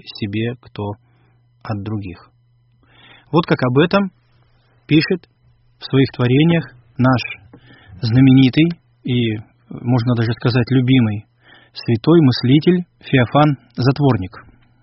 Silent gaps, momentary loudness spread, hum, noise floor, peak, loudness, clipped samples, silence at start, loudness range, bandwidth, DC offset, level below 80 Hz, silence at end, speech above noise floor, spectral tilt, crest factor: none; 16 LU; none; -56 dBFS; 0 dBFS; -16 LUFS; under 0.1%; 0.05 s; 5 LU; 5.8 kHz; under 0.1%; -48 dBFS; 0.4 s; 40 dB; -6.5 dB/octave; 16 dB